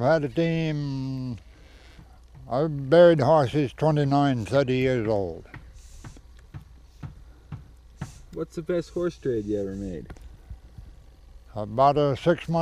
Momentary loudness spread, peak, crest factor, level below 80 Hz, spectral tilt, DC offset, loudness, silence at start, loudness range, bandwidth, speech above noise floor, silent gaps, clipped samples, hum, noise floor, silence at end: 23 LU; -6 dBFS; 20 dB; -48 dBFS; -7.5 dB/octave; under 0.1%; -24 LUFS; 0 s; 14 LU; 11 kHz; 26 dB; none; under 0.1%; none; -49 dBFS; 0 s